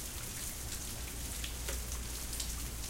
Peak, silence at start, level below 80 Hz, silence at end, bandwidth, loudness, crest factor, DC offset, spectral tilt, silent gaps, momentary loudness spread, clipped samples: -20 dBFS; 0 s; -44 dBFS; 0 s; 17 kHz; -40 LUFS; 20 dB; under 0.1%; -2.5 dB/octave; none; 2 LU; under 0.1%